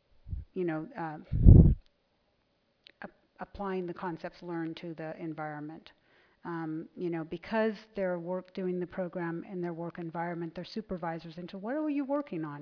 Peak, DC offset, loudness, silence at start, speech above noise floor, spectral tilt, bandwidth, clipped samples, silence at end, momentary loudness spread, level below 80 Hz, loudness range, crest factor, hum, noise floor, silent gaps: -2 dBFS; under 0.1%; -32 LUFS; 0.25 s; 42 dB; -8.5 dB/octave; 5.4 kHz; under 0.1%; 0 s; 15 LU; -36 dBFS; 12 LU; 28 dB; none; -74 dBFS; none